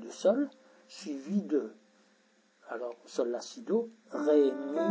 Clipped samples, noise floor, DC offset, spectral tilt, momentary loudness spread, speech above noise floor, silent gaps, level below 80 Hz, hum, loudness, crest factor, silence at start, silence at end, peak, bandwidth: under 0.1%; -67 dBFS; under 0.1%; -6 dB/octave; 15 LU; 36 dB; none; under -90 dBFS; none; -32 LUFS; 18 dB; 0 s; 0 s; -14 dBFS; 8 kHz